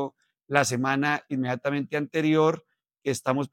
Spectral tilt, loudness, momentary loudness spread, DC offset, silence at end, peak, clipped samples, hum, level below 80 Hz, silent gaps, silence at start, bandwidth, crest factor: -5 dB/octave; -26 LUFS; 9 LU; under 0.1%; 0.05 s; -4 dBFS; under 0.1%; none; -76 dBFS; none; 0 s; 16.5 kHz; 22 dB